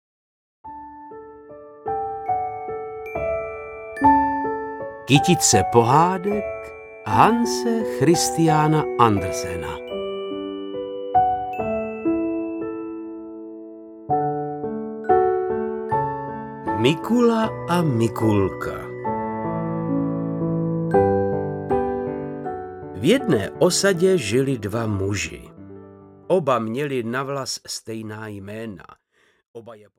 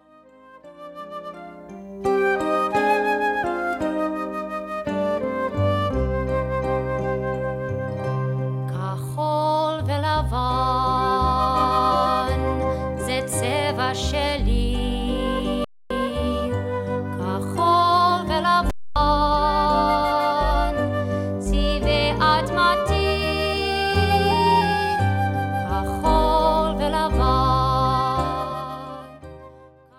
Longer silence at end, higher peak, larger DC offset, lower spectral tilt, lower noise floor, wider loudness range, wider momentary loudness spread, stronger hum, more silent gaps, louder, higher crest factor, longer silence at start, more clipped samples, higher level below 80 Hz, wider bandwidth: about the same, 0.2 s vs 0.3 s; first, 0 dBFS vs -4 dBFS; neither; about the same, -5 dB/octave vs -5.5 dB/octave; second, -44 dBFS vs -50 dBFS; about the same, 7 LU vs 5 LU; first, 18 LU vs 9 LU; neither; first, 29.48-29.54 s vs none; about the same, -22 LUFS vs -22 LUFS; first, 22 dB vs 16 dB; about the same, 0.65 s vs 0.55 s; neither; second, -50 dBFS vs -32 dBFS; about the same, 17 kHz vs 16.5 kHz